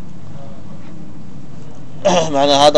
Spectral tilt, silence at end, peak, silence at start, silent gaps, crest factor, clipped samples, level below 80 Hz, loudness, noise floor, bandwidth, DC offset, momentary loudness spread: -4 dB/octave; 0 s; 0 dBFS; 0 s; none; 18 dB; 0.2%; -48 dBFS; -14 LUFS; -35 dBFS; 11 kHz; 9%; 23 LU